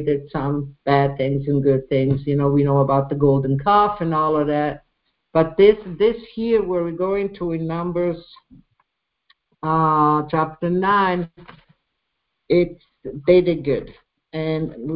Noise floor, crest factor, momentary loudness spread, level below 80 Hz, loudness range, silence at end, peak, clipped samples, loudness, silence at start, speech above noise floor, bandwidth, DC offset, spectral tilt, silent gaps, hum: -75 dBFS; 18 dB; 10 LU; -48 dBFS; 5 LU; 0 s; -2 dBFS; under 0.1%; -20 LUFS; 0 s; 56 dB; 5.2 kHz; under 0.1%; -12.5 dB/octave; none; none